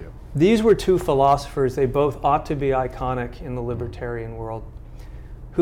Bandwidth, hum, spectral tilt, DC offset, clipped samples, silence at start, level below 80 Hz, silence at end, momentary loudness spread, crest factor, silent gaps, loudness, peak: 16 kHz; none; -7 dB/octave; under 0.1%; under 0.1%; 0 s; -38 dBFS; 0 s; 22 LU; 16 dB; none; -22 LUFS; -4 dBFS